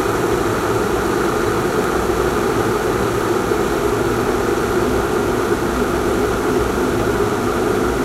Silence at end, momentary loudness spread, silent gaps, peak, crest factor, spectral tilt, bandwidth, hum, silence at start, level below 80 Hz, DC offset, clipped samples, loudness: 0 s; 1 LU; none; -4 dBFS; 12 dB; -5.5 dB/octave; 16 kHz; none; 0 s; -32 dBFS; under 0.1%; under 0.1%; -18 LUFS